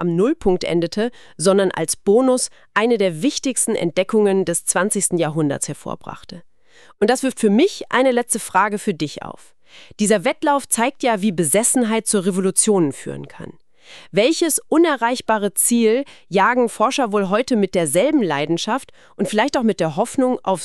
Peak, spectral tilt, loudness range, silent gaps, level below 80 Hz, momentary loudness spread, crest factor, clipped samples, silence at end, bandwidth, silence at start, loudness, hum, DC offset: -2 dBFS; -4 dB/octave; 3 LU; none; -50 dBFS; 9 LU; 16 dB; under 0.1%; 0 s; 14 kHz; 0 s; -18 LUFS; none; 0.5%